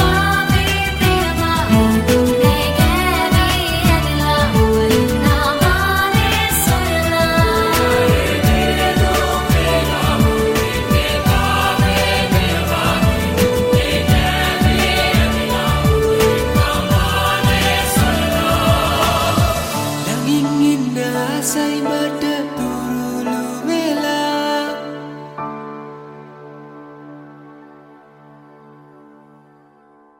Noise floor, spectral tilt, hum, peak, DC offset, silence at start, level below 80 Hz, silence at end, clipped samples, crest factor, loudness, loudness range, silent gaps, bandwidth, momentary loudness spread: -50 dBFS; -5 dB/octave; none; -2 dBFS; under 0.1%; 0 s; -26 dBFS; 2.6 s; under 0.1%; 14 dB; -15 LUFS; 7 LU; none; 16.5 kHz; 6 LU